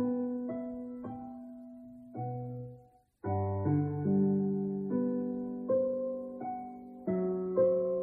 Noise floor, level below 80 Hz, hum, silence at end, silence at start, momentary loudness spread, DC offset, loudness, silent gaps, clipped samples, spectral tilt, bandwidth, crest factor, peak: -59 dBFS; -68 dBFS; none; 0 s; 0 s; 17 LU; under 0.1%; -34 LUFS; none; under 0.1%; -13.5 dB/octave; 2.4 kHz; 16 dB; -18 dBFS